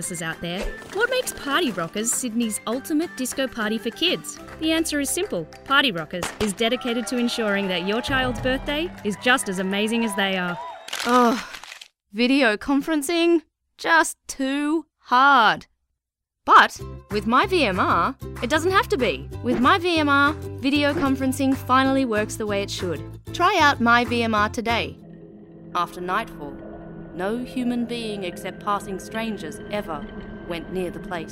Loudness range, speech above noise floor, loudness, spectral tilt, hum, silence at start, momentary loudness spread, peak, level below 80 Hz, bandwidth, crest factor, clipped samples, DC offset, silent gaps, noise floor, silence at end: 9 LU; 61 dB; -22 LUFS; -3.5 dB/octave; none; 0 s; 13 LU; -4 dBFS; -46 dBFS; 16 kHz; 20 dB; under 0.1%; under 0.1%; none; -83 dBFS; 0 s